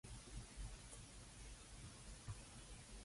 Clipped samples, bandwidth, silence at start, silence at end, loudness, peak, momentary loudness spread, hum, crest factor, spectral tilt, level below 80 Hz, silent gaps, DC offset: under 0.1%; 11.5 kHz; 0.05 s; 0 s; -57 LUFS; -38 dBFS; 3 LU; none; 18 dB; -3.5 dB/octave; -58 dBFS; none; under 0.1%